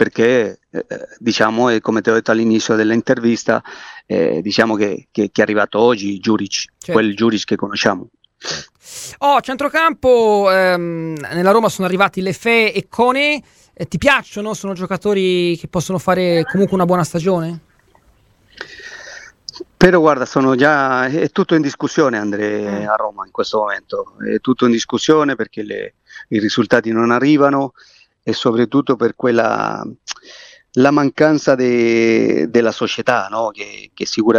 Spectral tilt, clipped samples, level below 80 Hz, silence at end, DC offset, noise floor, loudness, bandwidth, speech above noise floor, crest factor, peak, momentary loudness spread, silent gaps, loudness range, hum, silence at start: -5 dB/octave; under 0.1%; -48 dBFS; 0 s; under 0.1%; -54 dBFS; -16 LUFS; 15 kHz; 38 dB; 16 dB; 0 dBFS; 14 LU; none; 4 LU; none; 0 s